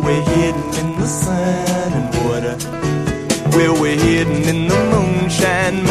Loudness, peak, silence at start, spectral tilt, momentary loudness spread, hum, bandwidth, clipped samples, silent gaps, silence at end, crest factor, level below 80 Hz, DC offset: -16 LUFS; 0 dBFS; 0 s; -5.5 dB/octave; 6 LU; none; 15 kHz; under 0.1%; none; 0 s; 16 dB; -34 dBFS; under 0.1%